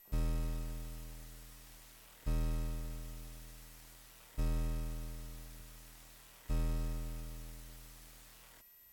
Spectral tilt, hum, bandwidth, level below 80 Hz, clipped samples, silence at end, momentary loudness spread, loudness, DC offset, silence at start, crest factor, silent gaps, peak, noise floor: -5.5 dB/octave; none; 19 kHz; -40 dBFS; under 0.1%; 0 s; 17 LU; -43 LUFS; under 0.1%; 0 s; 12 dB; none; -28 dBFS; -60 dBFS